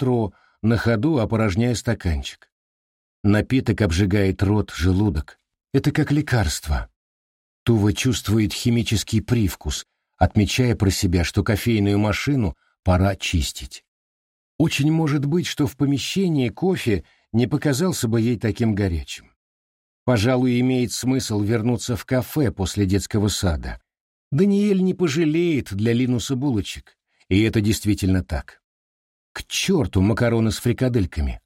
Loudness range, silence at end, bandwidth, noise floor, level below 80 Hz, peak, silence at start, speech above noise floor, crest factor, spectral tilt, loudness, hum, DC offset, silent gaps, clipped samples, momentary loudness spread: 2 LU; 0.1 s; 16.5 kHz; under -90 dBFS; -36 dBFS; -4 dBFS; 0 s; over 70 dB; 18 dB; -6 dB/octave; -21 LUFS; none; under 0.1%; 2.52-3.24 s, 6.96-7.66 s, 13.88-14.59 s, 19.36-20.06 s, 24.00-24.31 s, 28.64-29.35 s; under 0.1%; 9 LU